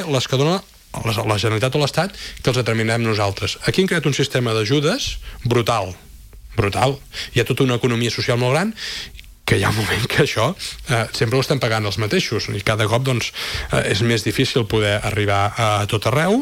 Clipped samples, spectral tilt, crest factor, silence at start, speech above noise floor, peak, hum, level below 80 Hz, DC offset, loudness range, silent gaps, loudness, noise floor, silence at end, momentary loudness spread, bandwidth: under 0.1%; -5 dB/octave; 16 dB; 0 s; 20 dB; -4 dBFS; none; -42 dBFS; under 0.1%; 1 LU; none; -19 LUFS; -39 dBFS; 0 s; 7 LU; 16.5 kHz